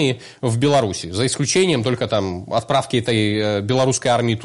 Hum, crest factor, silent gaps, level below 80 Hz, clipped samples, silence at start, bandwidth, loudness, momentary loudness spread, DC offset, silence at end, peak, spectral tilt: none; 12 dB; none; -52 dBFS; under 0.1%; 0 s; 11.5 kHz; -19 LUFS; 6 LU; under 0.1%; 0 s; -6 dBFS; -4.5 dB/octave